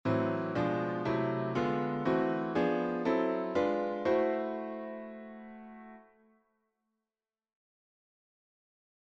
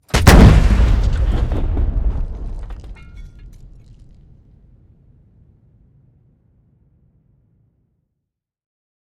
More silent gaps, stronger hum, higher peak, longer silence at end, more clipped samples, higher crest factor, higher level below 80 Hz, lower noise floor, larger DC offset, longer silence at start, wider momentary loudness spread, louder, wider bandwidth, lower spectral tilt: neither; neither; second, -18 dBFS vs 0 dBFS; second, 3.05 s vs 5.55 s; second, under 0.1% vs 0.4%; about the same, 16 dB vs 18 dB; second, -68 dBFS vs -20 dBFS; first, under -90 dBFS vs -79 dBFS; neither; about the same, 0.05 s vs 0.15 s; second, 17 LU vs 27 LU; second, -32 LUFS vs -15 LUFS; second, 7.6 kHz vs 17 kHz; first, -8 dB/octave vs -6 dB/octave